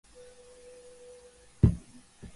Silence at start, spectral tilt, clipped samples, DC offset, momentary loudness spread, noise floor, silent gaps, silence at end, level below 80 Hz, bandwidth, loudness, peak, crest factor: 1.65 s; -8.5 dB/octave; under 0.1%; under 0.1%; 26 LU; -55 dBFS; none; 0.1 s; -40 dBFS; 11.5 kHz; -28 LUFS; -8 dBFS; 26 dB